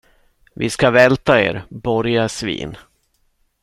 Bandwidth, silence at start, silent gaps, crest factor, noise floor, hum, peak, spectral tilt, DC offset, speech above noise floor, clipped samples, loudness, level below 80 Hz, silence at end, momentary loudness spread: 13.5 kHz; 0.6 s; none; 18 dB; -63 dBFS; none; 0 dBFS; -5 dB/octave; under 0.1%; 47 dB; under 0.1%; -17 LUFS; -46 dBFS; 0.85 s; 13 LU